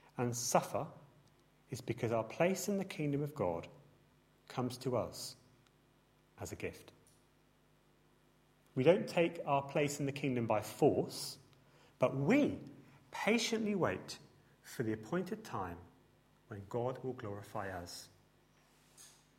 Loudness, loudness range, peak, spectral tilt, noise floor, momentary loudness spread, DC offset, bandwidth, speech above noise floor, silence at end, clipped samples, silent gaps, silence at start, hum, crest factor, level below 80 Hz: -37 LUFS; 11 LU; -16 dBFS; -5 dB/octave; -70 dBFS; 17 LU; under 0.1%; 16 kHz; 34 dB; 0.3 s; under 0.1%; none; 0.15 s; none; 24 dB; -72 dBFS